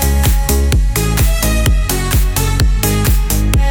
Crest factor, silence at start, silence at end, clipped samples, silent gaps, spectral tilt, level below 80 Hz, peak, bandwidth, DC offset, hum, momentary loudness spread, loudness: 12 dB; 0 s; 0 s; under 0.1%; none; -4.5 dB/octave; -14 dBFS; 0 dBFS; 19.5 kHz; under 0.1%; none; 2 LU; -14 LUFS